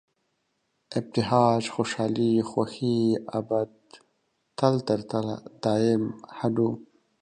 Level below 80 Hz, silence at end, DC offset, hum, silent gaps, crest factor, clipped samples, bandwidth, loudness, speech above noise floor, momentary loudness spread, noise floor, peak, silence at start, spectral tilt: -64 dBFS; 0.4 s; under 0.1%; none; none; 20 dB; under 0.1%; 9.8 kHz; -26 LUFS; 50 dB; 10 LU; -75 dBFS; -6 dBFS; 0.9 s; -6.5 dB/octave